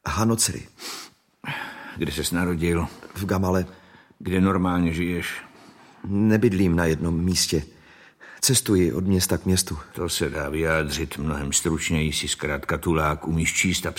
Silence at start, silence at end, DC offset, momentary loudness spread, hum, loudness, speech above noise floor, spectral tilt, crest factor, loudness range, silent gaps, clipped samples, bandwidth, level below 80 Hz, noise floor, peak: 0.05 s; 0 s; under 0.1%; 13 LU; none; -23 LUFS; 27 dB; -4.5 dB/octave; 18 dB; 4 LU; none; under 0.1%; 16.5 kHz; -40 dBFS; -50 dBFS; -6 dBFS